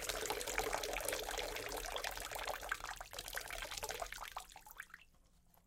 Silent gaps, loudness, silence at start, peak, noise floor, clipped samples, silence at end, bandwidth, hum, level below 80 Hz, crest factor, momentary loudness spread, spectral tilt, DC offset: none; -43 LUFS; 0 s; -16 dBFS; -69 dBFS; under 0.1%; 0.45 s; 17 kHz; none; -58 dBFS; 28 dB; 14 LU; -1 dB/octave; under 0.1%